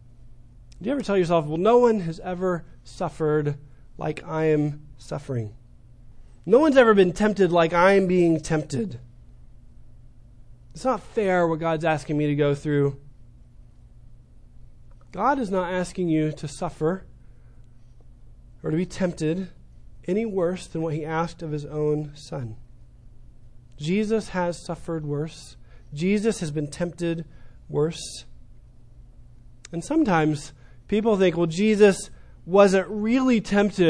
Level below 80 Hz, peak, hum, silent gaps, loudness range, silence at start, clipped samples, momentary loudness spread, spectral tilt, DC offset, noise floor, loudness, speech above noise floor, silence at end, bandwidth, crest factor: -48 dBFS; -4 dBFS; none; none; 9 LU; 0.2 s; under 0.1%; 17 LU; -6.5 dB/octave; under 0.1%; -48 dBFS; -23 LUFS; 25 dB; 0 s; 10.5 kHz; 20 dB